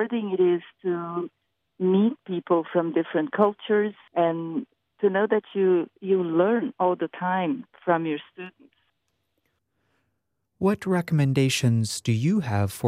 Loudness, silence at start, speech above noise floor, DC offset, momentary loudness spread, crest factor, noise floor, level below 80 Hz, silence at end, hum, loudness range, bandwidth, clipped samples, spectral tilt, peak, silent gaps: -25 LUFS; 0 s; 54 dB; under 0.1%; 9 LU; 18 dB; -78 dBFS; -68 dBFS; 0 s; none; 6 LU; 15 kHz; under 0.1%; -6.5 dB/octave; -6 dBFS; none